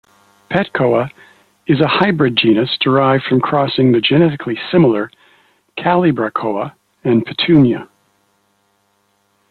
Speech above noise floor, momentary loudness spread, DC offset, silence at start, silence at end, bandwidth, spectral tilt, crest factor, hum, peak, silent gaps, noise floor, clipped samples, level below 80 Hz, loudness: 48 dB; 12 LU; under 0.1%; 0.5 s; 1.65 s; 4.8 kHz; -8.5 dB/octave; 16 dB; none; 0 dBFS; none; -61 dBFS; under 0.1%; -52 dBFS; -14 LUFS